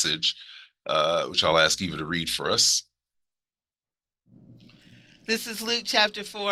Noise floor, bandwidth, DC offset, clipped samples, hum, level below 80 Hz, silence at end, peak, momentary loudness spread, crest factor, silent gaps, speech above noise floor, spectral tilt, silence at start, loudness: under -90 dBFS; 16 kHz; under 0.1%; under 0.1%; none; -60 dBFS; 0 s; -4 dBFS; 11 LU; 24 dB; none; over 65 dB; -1.5 dB/octave; 0 s; -23 LUFS